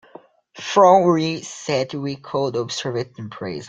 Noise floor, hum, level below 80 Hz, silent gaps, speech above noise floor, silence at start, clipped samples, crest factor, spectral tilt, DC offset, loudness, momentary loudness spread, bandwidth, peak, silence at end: -47 dBFS; none; -62 dBFS; none; 27 dB; 0.55 s; under 0.1%; 18 dB; -5 dB/octave; under 0.1%; -20 LUFS; 17 LU; 9.2 kHz; -2 dBFS; 0 s